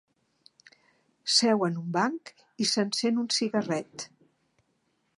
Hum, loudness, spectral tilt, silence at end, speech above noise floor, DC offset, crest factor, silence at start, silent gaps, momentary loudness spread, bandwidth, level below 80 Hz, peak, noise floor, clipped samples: none; -27 LUFS; -3.5 dB/octave; 1.1 s; 46 dB; under 0.1%; 22 dB; 1.25 s; none; 18 LU; 11.5 kHz; -80 dBFS; -8 dBFS; -74 dBFS; under 0.1%